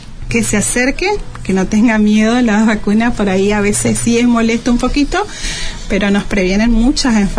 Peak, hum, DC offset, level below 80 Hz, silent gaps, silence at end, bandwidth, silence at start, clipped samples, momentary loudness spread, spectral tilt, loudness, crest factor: -2 dBFS; none; under 0.1%; -24 dBFS; none; 0 s; 11 kHz; 0 s; under 0.1%; 7 LU; -4.5 dB/octave; -13 LUFS; 10 dB